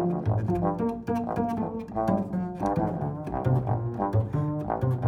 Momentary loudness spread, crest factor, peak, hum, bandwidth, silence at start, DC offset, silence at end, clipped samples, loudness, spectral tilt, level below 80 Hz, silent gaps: 4 LU; 14 dB; -12 dBFS; none; 9.6 kHz; 0 s; under 0.1%; 0 s; under 0.1%; -28 LUFS; -10 dB/octave; -48 dBFS; none